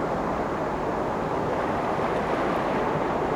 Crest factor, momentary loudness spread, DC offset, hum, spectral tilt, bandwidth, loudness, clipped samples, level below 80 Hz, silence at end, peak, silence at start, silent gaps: 12 dB; 2 LU; under 0.1%; none; -6.5 dB/octave; over 20 kHz; -26 LUFS; under 0.1%; -46 dBFS; 0 s; -14 dBFS; 0 s; none